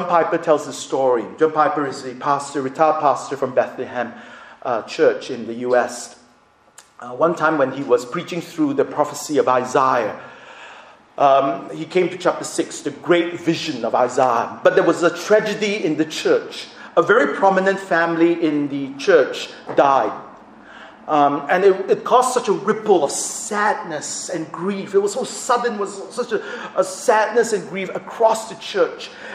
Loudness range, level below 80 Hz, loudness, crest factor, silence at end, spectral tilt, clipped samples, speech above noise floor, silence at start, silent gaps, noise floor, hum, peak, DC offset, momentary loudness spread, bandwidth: 4 LU; -68 dBFS; -19 LUFS; 20 dB; 0 s; -4 dB/octave; under 0.1%; 35 dB; 0 s; none; -54 dBFS; none; 0 dBFS; under 0.1%; 11 LU; 15 kHz